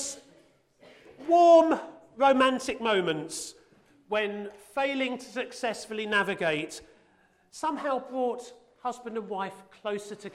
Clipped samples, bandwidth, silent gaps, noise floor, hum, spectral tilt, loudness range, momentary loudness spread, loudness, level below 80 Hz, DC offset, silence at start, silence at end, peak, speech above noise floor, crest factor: under 0.1%; 13.5 kHz; none; -64 dBFS; none; -3.5 dB/octave; 10 LU; 17 LU; -27 LUFS; -68 dBFS; under 0.1%; 0 s; 0.05 s; -8 dBFS; 37 dB; 20 dB